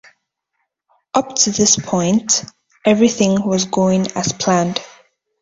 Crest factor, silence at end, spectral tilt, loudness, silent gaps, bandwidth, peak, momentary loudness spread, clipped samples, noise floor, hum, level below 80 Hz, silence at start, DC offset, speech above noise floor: 18 dB; 0.55 s; -4 dB/octave; -16 LUFS; none; 7.8 kHz; 0 dBFS; 7 LU; under 0.1%; -73 dBFS; none; -54 dBFS; 1.15 s; under 0.1%; 57 dB